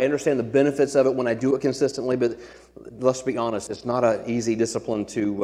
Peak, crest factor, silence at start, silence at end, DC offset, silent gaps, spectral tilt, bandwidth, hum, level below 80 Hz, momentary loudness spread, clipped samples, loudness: -6 dBFS; 18 dB; 0 s; 0 s; under 0.1%; none; -5.5 dB/octave; 12.5 kHz; none; -58 dBFS; 7 LU; under 0.1%; -23 LUFS